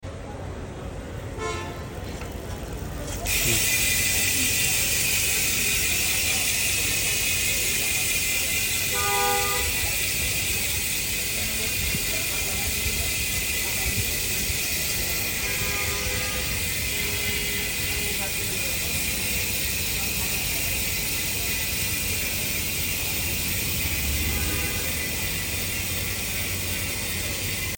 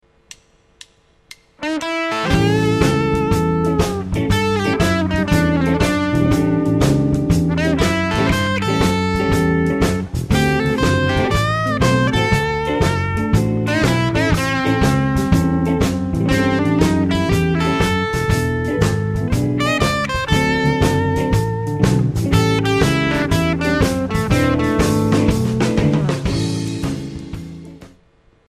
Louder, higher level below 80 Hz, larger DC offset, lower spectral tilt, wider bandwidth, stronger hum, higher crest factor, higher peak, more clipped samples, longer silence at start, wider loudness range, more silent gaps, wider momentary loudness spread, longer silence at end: second, -23 LUFS vs -17 LUFS; second, -38 dBFS vs -30 dBFS; neither; second, -1.5 dB/octave vs -6 dB/octave; about the same, 17 kHz vs 15.5 kHz; neither; about the same, 18 dB vs 16 dB; second, -8 dBFS vs 0 dBFS; neither; second, 0 s vs 1.6 s; first, 4 LU vs 1 LU; neither; first, 10 LU vs 4 LU; second, 0 s vs 0.6 s